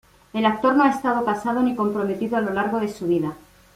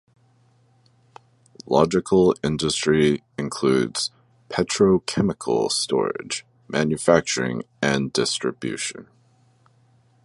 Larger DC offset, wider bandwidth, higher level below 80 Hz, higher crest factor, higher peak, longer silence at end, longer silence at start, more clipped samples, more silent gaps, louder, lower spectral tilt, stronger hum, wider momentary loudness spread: neither; first, 15.5 kHz vs 11.5 kHz; second, -58 dBFS vs -52 dBFS; second, 16 dB vs 22 dB; second, -6 dBFS vs -2 dBFS; second, 0.4 s vs 1.25 s; second, 0.35 s vs 1.7 s; neither; neither; about the same, -22 LUFS vs -22 LUFS; first, -6.5 dB/octave vs -4.5 dB/octave; neither; second, 7 LU vs 10 LU